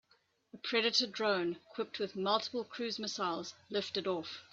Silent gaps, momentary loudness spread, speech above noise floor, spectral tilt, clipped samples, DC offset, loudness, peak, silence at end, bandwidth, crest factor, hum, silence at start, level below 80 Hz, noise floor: none; 10 LU; 37 dB; -3 dB/octave; under 0.1%; under 0.1%; -35 LUFS; -16 dBFS; 0.1 s; 7.8 kHz; 20 dB; none; 0.55 s; -82 dBFS; -73 dBFS